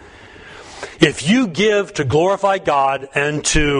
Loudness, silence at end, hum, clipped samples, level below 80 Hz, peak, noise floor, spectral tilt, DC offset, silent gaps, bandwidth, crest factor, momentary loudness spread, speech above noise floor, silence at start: -16 LUFS; 0 s; none; under 0.1%; -34 dBFS; 0 dBFS; -40 dBFS; -4 dB/octave; under 0.1%; none; 11 kHz; 18 dB; 18 LU; 24 dB; 0.25 s